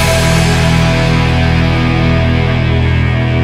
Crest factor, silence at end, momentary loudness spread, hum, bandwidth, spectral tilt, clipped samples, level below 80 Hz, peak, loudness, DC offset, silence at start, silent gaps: 10 dB; 0 s; 2 LU; none; 15.5 kHz; -5.5 dB/octave; under 0.1%; -20 dBFS; 0 dBFS; -11 LUFS; under 0.1%; 0 s; none